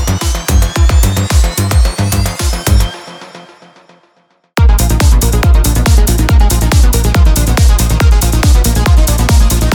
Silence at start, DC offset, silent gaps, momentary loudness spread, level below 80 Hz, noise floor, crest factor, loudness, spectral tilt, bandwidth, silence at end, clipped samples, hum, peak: 0 s; under 0.1%; none; 4 LU; -10 dBFS; -54 dBFS; 8 dB; -11 LUFS; -5 dB/octave; 19 kHz; 0 s; under 0.1%; none; 0 dBFS